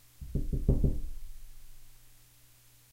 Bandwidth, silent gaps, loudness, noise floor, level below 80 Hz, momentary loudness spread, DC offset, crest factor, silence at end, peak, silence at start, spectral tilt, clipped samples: 16 kHz; none; -34 LUFS; -60 dBFS; -36 dBFS; 26 LU; under 0.1%; 22 dB; 0.75 s; -12 dBFS; 0.2 s; -8.5 dB/octave; under 0.1%